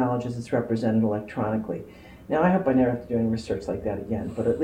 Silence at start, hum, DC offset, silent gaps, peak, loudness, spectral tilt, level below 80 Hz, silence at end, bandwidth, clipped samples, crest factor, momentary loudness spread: 0 s; none; under 0.1%; none; -8 dBFS; -26 LUFS; -8.5 dB/octave; -50 dBFS; 0 s; 10 kHz; under 0.1%; 18 dB; 9 LU